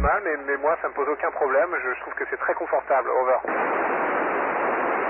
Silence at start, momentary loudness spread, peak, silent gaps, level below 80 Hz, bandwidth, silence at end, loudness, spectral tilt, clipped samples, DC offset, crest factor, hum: 0 s; 4 LU; -10 dBFS; none; -42 dBFS; 3.3 kHz; 0 s; -24 LUFS; -10.5 dB/octave; under 0.1%; under 0.1%; 14 dB; none